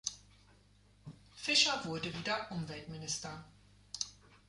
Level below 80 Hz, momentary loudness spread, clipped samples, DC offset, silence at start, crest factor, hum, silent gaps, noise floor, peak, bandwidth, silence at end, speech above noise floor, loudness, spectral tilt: -66 dBFS; 27 LU; under 0.1%; under 0.1%; 0.05 s; 24 dB; 50 Hz at -60 dBFS; none; -65 dBFS; -16 dBFS; 11.5 kHz; 0.15 s; 29 dB; -35 LUFS; -2 dB/octave